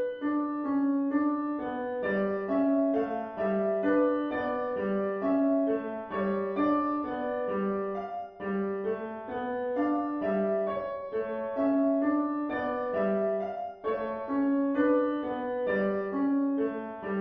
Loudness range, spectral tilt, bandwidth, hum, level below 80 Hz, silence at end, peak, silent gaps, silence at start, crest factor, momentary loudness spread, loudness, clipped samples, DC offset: 3 LU; -10 dB/octave; 5 kHz; none; -66 dBFS; 0 s; -16 dBFS; none; 0 s; 14 dB; 8 LU; -30 LUFS; under 0.1%; under 0.1%